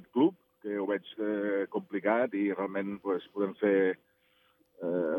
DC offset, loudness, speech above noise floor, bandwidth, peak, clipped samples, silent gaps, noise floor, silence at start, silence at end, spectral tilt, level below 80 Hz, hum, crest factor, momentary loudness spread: under 0.1%; -31 LUFS; 38 dB; 3.9 kHz; -12 dBFS; under 0.1%; none; -69 dBFS; 0.15 s; 0 s; -9 dB/octave; -86 dBFS; none; 18 dB; 7 LU